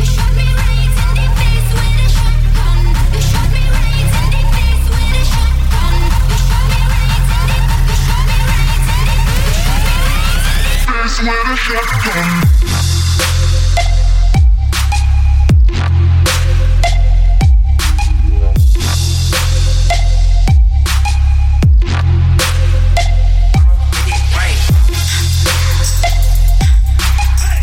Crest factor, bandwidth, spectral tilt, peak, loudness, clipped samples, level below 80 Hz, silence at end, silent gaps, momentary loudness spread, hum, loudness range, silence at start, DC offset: 8 dB; 16.5 kHz; -4.5 dB/octave; -2 dBFS; -13 LUFS; under 0.1%; -10 dBFS; 0 s; none; 3 LU; none; 2 LU; 0 s; under 0.1%